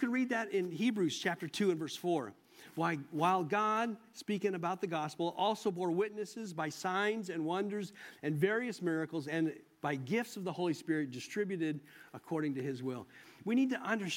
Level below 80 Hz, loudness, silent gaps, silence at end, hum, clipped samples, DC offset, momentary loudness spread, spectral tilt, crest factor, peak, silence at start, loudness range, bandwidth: -84 dBFS; -36 LUFS; none; 0 s; none; under 0.1%; under 0.1%; 10 LU; -5.5 dB/octave; 18 dB; -18 dBFS; 0 s; 3 LU; 16.5 kHz